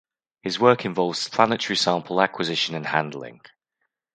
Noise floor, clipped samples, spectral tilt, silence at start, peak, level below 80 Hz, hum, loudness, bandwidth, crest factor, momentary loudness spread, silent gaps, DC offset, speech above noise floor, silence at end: -78 dBFS; under 0.1%; -4 dB/octave; 0.45 s; 0 dBFS; -68 dBFS; none; -22 LUFS; 9.4 kHz; 24 dB; 13 LU; none; under 0.1%; 55 dB; 0.85 s